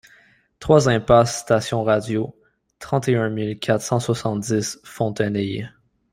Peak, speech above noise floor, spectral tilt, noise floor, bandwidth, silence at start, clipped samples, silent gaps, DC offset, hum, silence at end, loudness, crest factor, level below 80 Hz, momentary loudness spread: -2 dBFS; 35 dB; -5.5 dB/octave; -55 dBFS; 16 kHz; 0.6 s; under 0.1%; none; under 0.1%; none; 0.45 s; -21 LUFS; 20 dB; -48 dBFS; 13 LU